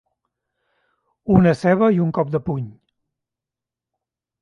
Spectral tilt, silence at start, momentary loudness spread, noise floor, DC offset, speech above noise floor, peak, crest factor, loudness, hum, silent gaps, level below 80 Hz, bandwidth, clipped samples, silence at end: -9 dB/octave; 1.25 s; 15 LU; -87 dBFS; under 0.1%; 70 dB; 0 dBFS; 22 dB; -18 LUFS; none; none; -48 dBFS; 9.6 kHz; under 0.1%; 1.7 s